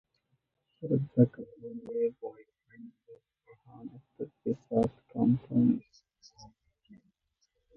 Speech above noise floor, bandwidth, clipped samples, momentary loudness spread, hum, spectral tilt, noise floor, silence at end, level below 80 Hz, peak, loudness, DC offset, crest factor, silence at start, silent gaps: 47 dB; 6.2 kHz; under 0.1%; 22 LU; none; -10.5 dB/octave; -78 dBFS; 0.85 s; -66 dBFS; -10 dBFS; -30 LUFS; under 0.1%; 22 dB; 0.8 s; none